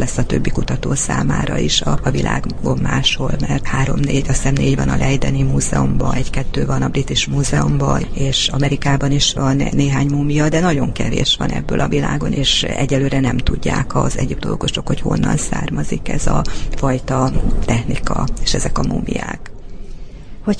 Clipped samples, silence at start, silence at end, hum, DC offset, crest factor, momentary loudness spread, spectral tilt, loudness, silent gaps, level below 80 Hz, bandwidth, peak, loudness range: under 0.1%; 0 s; 0 s; none; under 0.1%; 14 dB; 6 LU; -5 dB/octave; -17 LUFS; none; -24 dBFS; 10.5 kHz; -2 dBFS; 3 LU